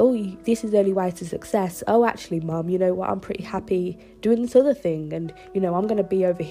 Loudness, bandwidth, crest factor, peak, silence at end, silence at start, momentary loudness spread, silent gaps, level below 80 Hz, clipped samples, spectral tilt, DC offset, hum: -23 LUFS; 15.5 kHz; 18 dB; -6 dBFS; 0 s; 0 s; 11 LU; none; -54 dBFS; under 0.1%; -7 dB/octave; under 0.1%; none